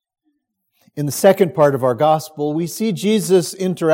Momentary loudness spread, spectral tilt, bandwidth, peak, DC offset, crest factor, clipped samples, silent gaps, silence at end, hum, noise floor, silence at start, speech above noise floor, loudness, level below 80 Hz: 9 LU; -5.5 dB/octave; 17 kHz; 0 dBFS; under 0.1%; 18 dB; under 0.1%; none; 0 s; none; -69 dBFS; 0.95 s; 53 dB; -17 LUFS; -66 dBFS